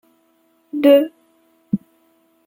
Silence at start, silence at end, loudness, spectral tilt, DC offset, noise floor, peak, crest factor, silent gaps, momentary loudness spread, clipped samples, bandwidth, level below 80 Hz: 0.75 s; 0.7 s; -17 LUFS; -7 dB/octave; under 0.1%; -60 dBFS; -2 dBFS; 18 dB; none; 15 LU; under 0.1%; 16.5 kHz; -66 dBFS